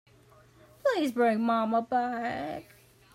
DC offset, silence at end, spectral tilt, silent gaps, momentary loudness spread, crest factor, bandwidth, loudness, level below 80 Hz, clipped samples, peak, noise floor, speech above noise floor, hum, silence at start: under 0.1%; 0.5 s; -5.5 dB/octave; none; 10 LU; 14 dB; 16 kHz; -29 LUFS; -68 dBFS; under 0.1%; -16 dBFS; -58 dBFS; 30 dB; none; 0.85 s